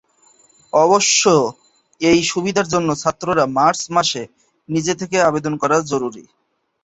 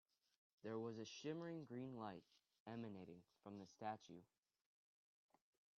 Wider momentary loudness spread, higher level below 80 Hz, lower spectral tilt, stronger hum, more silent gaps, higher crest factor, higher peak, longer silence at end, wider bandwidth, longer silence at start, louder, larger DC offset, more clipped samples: second, 10 LU vs 13 LU; first, -54 dBFS vs under -90 dBFS; second, -3.5 dB/octave vs -5.5 dB/octave; neither; second, none vs 2.60-2.66 s; about the same, 16 dB vs 20 dB; first, -2 dBFS vs -34 dBFS; second, 0.65 s vs 1.55 s; first, 8.2 kHz vs 7 kHz; about the same, 0.75 s vs 0.65 s; first, -17 LUFS vs -54 LUFS; neither; neither